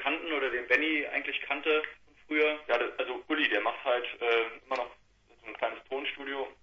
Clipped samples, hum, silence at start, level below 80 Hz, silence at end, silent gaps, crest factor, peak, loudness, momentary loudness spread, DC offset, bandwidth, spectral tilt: under 0.1%; none; 0 s; -70 dBFS; 0.1 s; none; 22 dB; -10 dBFS; -30 LUFS; 9 LU; under 0.1%; 7.2 kHz; -3.5 dB/octave